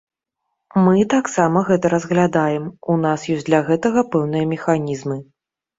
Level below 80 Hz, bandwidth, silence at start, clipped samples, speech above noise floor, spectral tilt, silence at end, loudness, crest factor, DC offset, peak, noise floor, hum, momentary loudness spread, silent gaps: -56 dBFS; 7.8 kHz; 0.75 s; under 0.1%; 60 dB; -6.5 dB/octave; 0.55 s; -18 LUFS; 16 dB; under 0.1%; -2 dBFS; -77 dBFS; none; 8 LU; none